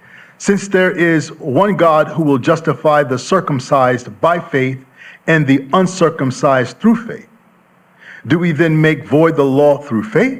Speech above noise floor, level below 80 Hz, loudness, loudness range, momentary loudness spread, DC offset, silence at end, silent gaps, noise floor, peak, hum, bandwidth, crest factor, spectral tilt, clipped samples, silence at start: 37 dB; -58 dBFS; -14 LUFS; 2 LU; 6 LU; under 0.1%; 0 s; none; -50 dBFS; 0 dBFS; none; 15 kHz; 14 dB; -6.5 dB/octave; under 0.1%; 0.4 s